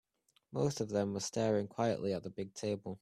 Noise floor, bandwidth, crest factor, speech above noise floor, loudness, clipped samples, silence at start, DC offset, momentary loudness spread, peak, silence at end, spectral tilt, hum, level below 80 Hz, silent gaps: -72 dBFS; 14.5 kHz; 18 dB; 37 dB; -36 LUFS; under 0.1%; 0.5 s; under 0.1%; 7 LU; -20 dBFS; 0.05 s; -5.5 dB/octave; none; -72 dBFS; none